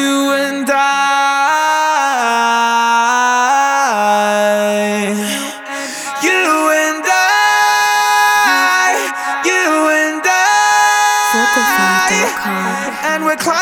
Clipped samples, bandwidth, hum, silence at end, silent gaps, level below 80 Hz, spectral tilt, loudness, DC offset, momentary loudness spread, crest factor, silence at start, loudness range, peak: under 0.1%; over 20 kHz; none; 0 s; none; -60 dBFS; -2 dB/octave; -12 LUFS; under 0.1%; 7 LU; 12 dB; 0 s; 3 LU; 0 dBFS